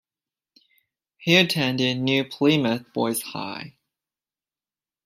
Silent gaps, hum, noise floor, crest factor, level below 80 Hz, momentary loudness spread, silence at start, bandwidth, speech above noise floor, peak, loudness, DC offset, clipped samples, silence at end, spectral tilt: none; none; under -90 dBFS; 22 dB; -70 dBFS; 15 LU; 1.2 s; 16 kHz; over 68 dB; -4 dBFS; -22 LUFS; under 0.1%; under 0.1%; 1.35 s; -4.5 dB/octave